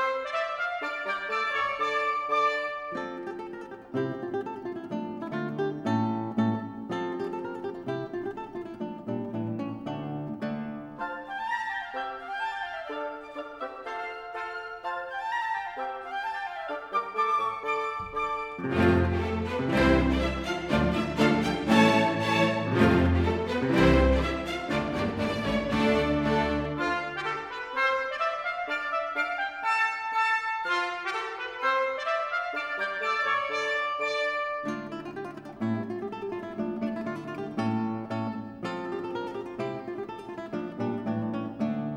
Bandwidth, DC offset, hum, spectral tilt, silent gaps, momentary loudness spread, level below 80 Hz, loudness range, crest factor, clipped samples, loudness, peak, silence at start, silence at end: 13.5 kHz; under 0.1%; none; -6 dB/octave; none; 12 LU; -44 dBFS; 10 LU; 20 dB; under 0.1%; -29 LUFS; -8 dBFS; 0 s; 0 s